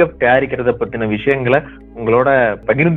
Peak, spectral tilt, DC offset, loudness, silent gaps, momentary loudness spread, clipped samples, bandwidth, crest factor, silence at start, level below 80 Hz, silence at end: 0 dBFS; -9.5 dB/octave; under 0.1%; -15 LUFS; none; 7 LU; under 0.1%; 4.2 kHz; 14 dB; 0 s; -40 dBFS; 0 s